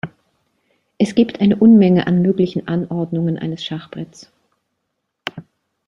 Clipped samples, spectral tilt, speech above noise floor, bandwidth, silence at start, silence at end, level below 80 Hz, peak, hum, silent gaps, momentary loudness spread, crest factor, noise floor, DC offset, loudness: under 0.1%; -8 dB/octave; 59 dB; 10 kHz; 0.05 s; 0.45 s; -56 dBFS; -2 dBFS; none; none; 21 LU; 16 dB; -74 dBFS; under 0.1%; -16 LUFS